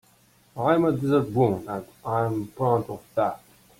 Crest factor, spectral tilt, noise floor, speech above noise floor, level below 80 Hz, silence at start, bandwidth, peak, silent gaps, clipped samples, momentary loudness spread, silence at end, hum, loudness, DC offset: 18 dB; -8.5 dB/octave; -59 dBFS; 35 dB; -60 dBFS; 0.55 s; 16.5 kHz; -8 dBFS; none; under 0.1%; 12 LU; 0.45 s; none; -25 LUFS; under 0.1%